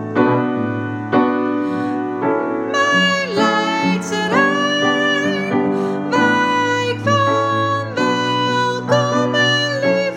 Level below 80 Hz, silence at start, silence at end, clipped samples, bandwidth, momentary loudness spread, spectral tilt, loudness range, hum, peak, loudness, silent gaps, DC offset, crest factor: -64 dBFS; 0 s; 0 s; under 0.1%; 12 kHz; 5 LU; -5 dB/octave; 1 LU; none; 0 dBFS; -17 LUFS; none; under 0.1%; 16 dB